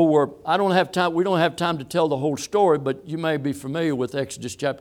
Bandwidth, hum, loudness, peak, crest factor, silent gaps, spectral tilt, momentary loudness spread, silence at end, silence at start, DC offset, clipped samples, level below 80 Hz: 16.5 kHz; none; -22 LUFS; -6 dBFS; 16 dB; none; -5.5 dB/octave; 8 LU; 0 s; 0 s; under 0.1%; under 0.1%; -62 dBFS